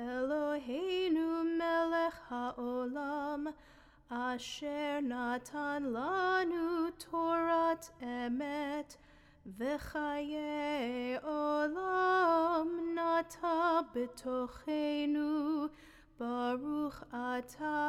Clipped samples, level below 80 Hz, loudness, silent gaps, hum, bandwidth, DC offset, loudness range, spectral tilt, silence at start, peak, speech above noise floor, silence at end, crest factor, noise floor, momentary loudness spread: under 0.1%; -64 dBFS; -35 LUFS; none; none; 15 kHz; under 0.1%; 6 LU; -4.5 dB/octave; 0 s; -20 dBFS; 26 dB; 0 s; 16 dB; -61 dBFS; 9 LU